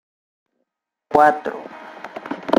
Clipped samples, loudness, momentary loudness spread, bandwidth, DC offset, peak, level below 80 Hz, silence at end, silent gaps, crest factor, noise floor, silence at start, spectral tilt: under 0.1%; -18 LUFS; 21 LU; 15.5 kHz; under 0.1%; -2 dBFS; -58 dBFS; 0 s; none; 20 dB; -77 dBFS; 1.1 s; -5.5 dB/octave